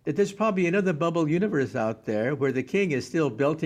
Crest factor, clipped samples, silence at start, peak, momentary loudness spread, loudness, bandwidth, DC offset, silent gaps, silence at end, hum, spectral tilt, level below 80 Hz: 14 dB; under 0.1%; 0.05 s; -12 dBFS; 4 LU; -26 LUFS; 10.5 kHz; under 0.1%; none; 0 s; none; -7 dB/octave; -64 dBFS